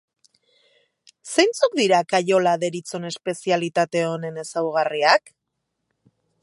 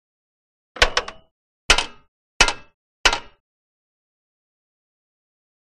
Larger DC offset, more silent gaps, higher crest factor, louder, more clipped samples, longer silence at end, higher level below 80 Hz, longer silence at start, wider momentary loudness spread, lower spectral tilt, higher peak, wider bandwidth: neither; second, none vs 1.31-1.69 s, 2.08-2.40 s, 2.74-3.04 s; about the same, 22 dB vs 26 dB; about the same, -21 LUFS vs -19 LUFS; neither; second, 1.25 s vs 2.4 s; second, -76 dBFS vs -34 dBFS; first, 1.25 s vs 0.75 s; second, 11 LU vs 15 LU; first, -4 dB/octave vs -0.5 dB/octave; about the same, -2 dBFS vs 0 dBFS; second, 11.5 kHz vs 15 kHz